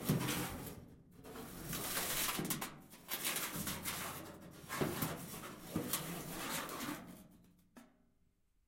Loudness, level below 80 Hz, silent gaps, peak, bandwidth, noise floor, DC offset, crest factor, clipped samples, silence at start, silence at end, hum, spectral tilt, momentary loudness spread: -41 LUFS; -64 dBFS; none; -20 dBFS; 16.5 kHz; -75 dBFS; under 0.1%; 22 dB; under 0.1%; 0 s; 0.8 s; none; -3 dB/octave; 17 LU